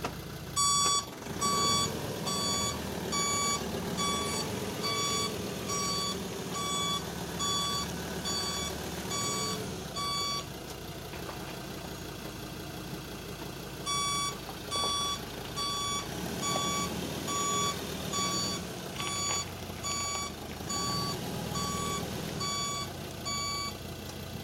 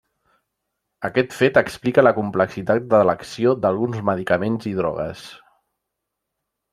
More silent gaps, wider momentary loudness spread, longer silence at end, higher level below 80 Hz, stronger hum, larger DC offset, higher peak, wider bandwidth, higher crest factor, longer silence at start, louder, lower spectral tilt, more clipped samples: neither; about the same, 12 LU vs 10 LU; second, 0 s vs 1.35 s; about the same, -52 dBFS vs -56 dBFS; neither; neither; second, -16 dBFS vs -2 dBFS; first, 16 kHz vs 14.5 kHz; about the same, 18 dB vs 20 dB; second, 0 s vs 1 s; second, -32 LUFS vs -20 LUFS; second, -2.5 dB/octave vs -6.5 dB/octave; neither